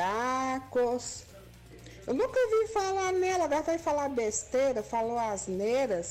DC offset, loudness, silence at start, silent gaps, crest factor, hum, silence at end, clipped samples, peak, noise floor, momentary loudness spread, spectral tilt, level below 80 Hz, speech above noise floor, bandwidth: under 0.1%; -30 LUFS; 0 s; none; 8 dB; none; 0 s; under 0.1%; -22 dBFS; -50 dBFS; 6 LU; -3.5 dB/octave; -58 dBFS; 21 dB; 15.5 kHz